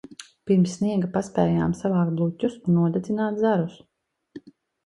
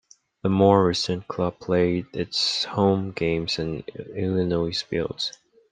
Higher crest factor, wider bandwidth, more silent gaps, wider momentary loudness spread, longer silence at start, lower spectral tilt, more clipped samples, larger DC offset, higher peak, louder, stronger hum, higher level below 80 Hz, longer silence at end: about the same, 18 dB vs 20 dB; first, 11 kHz vs 9.6 kHz; neither; second, 5 LU vs 11 LU; second, 0.1 s vs 0.45 s; first, -8 dB/octave vs -5.5 dB/octave; neither; neither; about the same, -6 dBFS vs -4 dBFS; about the same, -24 LUFS vs -24 LUFS; neither; about the same, -56 dBFS vs -54 dBFS; about the same, 0.35 s vs 0.4 s